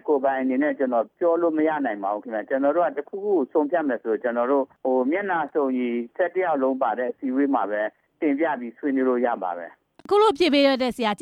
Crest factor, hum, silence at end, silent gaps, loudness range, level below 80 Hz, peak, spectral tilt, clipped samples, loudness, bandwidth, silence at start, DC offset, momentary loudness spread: 16 dB; none; 0 s; none; 2 LU; -68 dBFS; -8 dBFS; -5.5 dB/octave; under 0.1%; -23 LUFS; 11.5 kHz; 0.05 s; under 0.1%; 8 LU